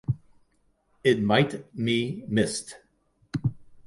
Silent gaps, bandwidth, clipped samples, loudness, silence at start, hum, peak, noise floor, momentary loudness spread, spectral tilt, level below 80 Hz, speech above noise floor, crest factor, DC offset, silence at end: none; 11.5 kHz; under 0.1%; -27 LUFS; 0.1 s; none; -6 dBFS; -68 dBFS; 12 LU; -5.5 dB/octave; -54 dBFS; 43 dB; 22 dB; under 0.1%; 0.05 s